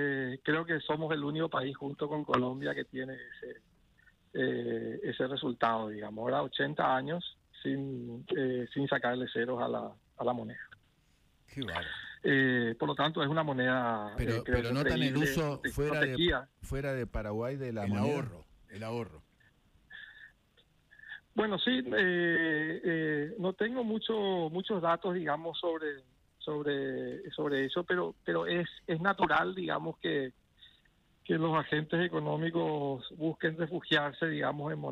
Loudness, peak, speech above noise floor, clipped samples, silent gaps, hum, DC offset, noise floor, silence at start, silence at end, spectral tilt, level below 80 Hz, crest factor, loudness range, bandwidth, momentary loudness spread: -33 LUFS; -14 dBFS; 36 dB; under 0.1%; none; none; under 0.1%; -69 dBFS; 0 s; 0 s; -6.5 dB/octave; -54 dBFS; 20 dB; 6 LU; 15 kHz; 11 LU